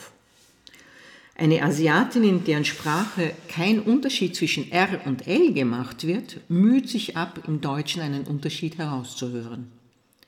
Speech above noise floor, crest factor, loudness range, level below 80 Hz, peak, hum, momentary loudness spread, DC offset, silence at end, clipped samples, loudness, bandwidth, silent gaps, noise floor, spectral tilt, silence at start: 36 dB; 16 dB; 3 LU; -68 dBFS; -8 dBFS; none; 10 LU; under 0.1%; 0.6 s; under 0.1%; -24 LUFS; 17 kHz; none; -59 dBFS; -5.5 dB/octave; 0 s